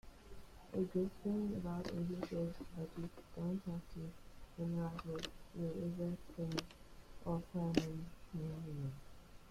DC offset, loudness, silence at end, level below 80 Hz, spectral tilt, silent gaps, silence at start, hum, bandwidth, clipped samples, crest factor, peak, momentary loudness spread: under 0.1%; -44 LUFS; 0 s; -60 dBFS; -7 dB/octave; none; 0.05 s; none; 15.5 kHz; under 0.1%; 28 dB; -16 dBFS; 19 LU